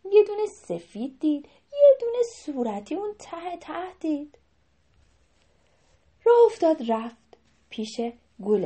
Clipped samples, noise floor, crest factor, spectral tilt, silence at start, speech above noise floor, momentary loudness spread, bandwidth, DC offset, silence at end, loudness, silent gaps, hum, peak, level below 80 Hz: under 0.1%; -67 dBFS; 18 dB; -6 dB/octave; 0.05 s; 41 dB; 18 LU; 8.4 kHz; under 0.1%; 0 s; -25 LUFS; none; none; -8 dBFS; -68 dBFS